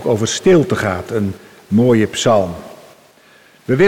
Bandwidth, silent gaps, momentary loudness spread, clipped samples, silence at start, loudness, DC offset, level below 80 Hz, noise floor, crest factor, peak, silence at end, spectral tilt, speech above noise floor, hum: 16.5 kHz; none; 14 LU; under 0.1%; 0 s; -15 LUFS; under 0.1%; -48 dBFS; -48 dBFS; 12 dB; -4 dBFS; 0 s; -5.5 dB/octave; 33 dB; none